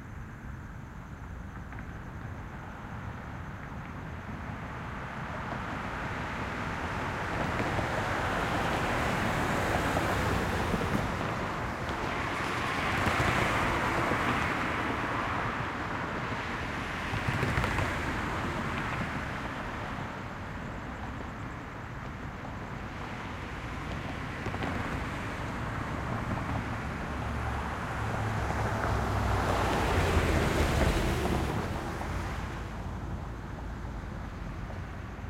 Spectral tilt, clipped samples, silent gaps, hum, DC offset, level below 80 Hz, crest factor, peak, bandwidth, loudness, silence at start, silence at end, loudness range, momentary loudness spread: -5.5 dB/octave; under 0.1%; none; none; under 0.1%; -42 dBFS; 20 dB; -12 dBFS; 16.5 kHz; -33 LUFS; 0 s; 0 s; 10 LU; 13 LU